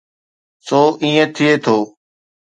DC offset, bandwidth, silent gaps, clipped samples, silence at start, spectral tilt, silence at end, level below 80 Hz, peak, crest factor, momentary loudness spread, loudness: under 0.1%; 9.2 kHz; none; under 0.1%; 0.65 s; -5.5 dB/octave; 0.55 s; -66 dBFS; 0 dBFS; 16 dB; 5 LU; -15 LUFS